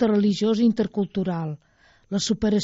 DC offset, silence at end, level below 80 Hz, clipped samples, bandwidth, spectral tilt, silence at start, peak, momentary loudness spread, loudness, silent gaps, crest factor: under 0.1%; 0 s; -52 dBFS; under 0.1%; 8 kHz; -6.5 dB/octave; 0 s; -10 dBFS; 10 LU; -23 LUFS; none; 14 dB